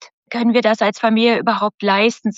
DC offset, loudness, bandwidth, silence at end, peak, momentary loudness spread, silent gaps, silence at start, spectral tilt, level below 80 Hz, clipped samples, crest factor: under 0.1%; -16 LUFS; 7.8 kHz; 0.05 s; -2 dBFS; 4 LU; 1.74-1.78 s; 0.3 s; -5 dB/octave; -70 dBFS; under 0.1%; 14 dB